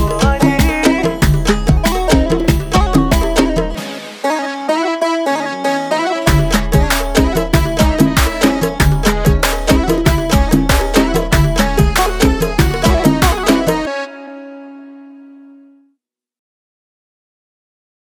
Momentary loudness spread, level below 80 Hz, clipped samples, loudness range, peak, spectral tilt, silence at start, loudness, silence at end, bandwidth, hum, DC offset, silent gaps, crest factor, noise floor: 6 LU; -20 dBFS; under 0.1%; 4 LU; 0 dBFS; -5 dB/octave; 0 s; -14 LUFS; 2.75 s; 20 kHz; none; under 0.1%; none; 14 dB; -67 dBFS